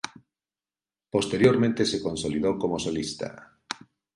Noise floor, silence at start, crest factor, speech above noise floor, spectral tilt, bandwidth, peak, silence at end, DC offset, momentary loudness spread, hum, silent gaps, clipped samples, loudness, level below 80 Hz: under -90 dBFS; 0.05 s; 22 dB; over 65 dB; -5 dB/octave; 11.5 kHz; -6 dBFS; 0.4 s; under 0.1%; 17 LU; none; none; under 0.1%; -25 LUFS; -56 dBFS